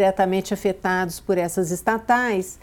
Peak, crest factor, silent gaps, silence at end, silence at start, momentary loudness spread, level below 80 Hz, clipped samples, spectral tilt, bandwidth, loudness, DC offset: -6 dBFS; 14 dB; none; 0.05 s; 0 s; 4 LU; -50 dBFS; under 0.1%; -5 dB/octave; 18 kHz; -22 LUFS; under 0.1%